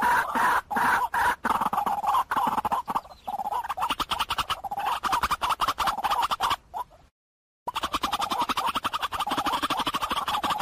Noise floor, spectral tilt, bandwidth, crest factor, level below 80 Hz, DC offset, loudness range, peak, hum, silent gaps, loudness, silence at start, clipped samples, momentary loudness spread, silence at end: under -90 dBFS; -2 dB/octave; 15.5 kHz; 14 dB; -52 dBFS; under 0.1%; 3 LU; -12 dBFS; none; 7.11-7.66 s; -27 LUFS; 0 s; under 0.1%; 8 LU; 0 s